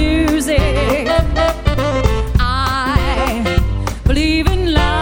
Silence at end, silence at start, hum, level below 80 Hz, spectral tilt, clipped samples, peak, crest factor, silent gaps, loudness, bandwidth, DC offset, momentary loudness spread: 0 s; 0 s; none; -18 dBFS; -5.5 dB/octave; under 0.1%; 0 dBFS; 14 dB; none; -16 LUFS; 17.5 kHz; under 0.1%; 3 LU